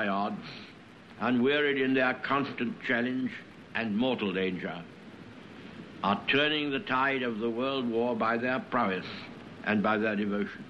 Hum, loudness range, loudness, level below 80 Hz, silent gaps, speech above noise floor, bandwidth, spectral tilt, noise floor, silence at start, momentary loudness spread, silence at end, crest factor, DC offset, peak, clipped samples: none; 4 LU; -29 LUFS; -70 dBFS; none; 21 dB; 7.2 kHz; -7 dB/octave; -51 dBFS; 0 s; 20 LU; 0 s; 18 dB; under 0.1%; -12 dBFS; under 0.1%